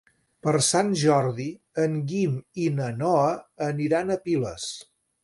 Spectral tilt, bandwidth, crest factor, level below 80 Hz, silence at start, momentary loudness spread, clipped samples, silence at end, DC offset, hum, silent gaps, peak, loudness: -5 dB/octave; 11.5 kHz; 18 dB; -62 dBFS; 0.45 s; 10 LU; under 0.1%; 0.4 s; under 0.1%; none; none; -8 dBFS; -25 LUFS